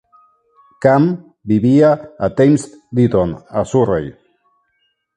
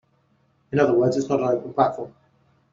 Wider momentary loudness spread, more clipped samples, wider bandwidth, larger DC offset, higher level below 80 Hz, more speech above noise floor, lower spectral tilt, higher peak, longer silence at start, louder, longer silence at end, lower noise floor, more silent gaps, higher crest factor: about the same, 10 LU vs 12 LU; neither; first, 11 kHz vs 7.6 kHz; neither; first, -44 dBFS vs -62 dBFS; first, 52 dB vs 43 dB; first, -8 dB/octave vs -6.5 dB/octave; first, 0 dBFS vs -4 dBFS; about the same, 0.8 s vs 0.7 s; first, -15 LUFS vs -22 LUFS; first, 1.05 s vs 0.6 s; about the same, -66 dBFS vs -64 dBFS; neither; about the same, 16 dB vs 20 dB